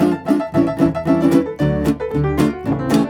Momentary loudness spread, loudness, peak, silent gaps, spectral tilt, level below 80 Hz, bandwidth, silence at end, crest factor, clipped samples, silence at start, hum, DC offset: 4 LU; -17 LUFS; -2 dBFS; none; -7.5 dB/octave; -36 dBFS; 18 kHz; 0 s; 14 dB; under 0.1%; 0 s; none; under 0.1%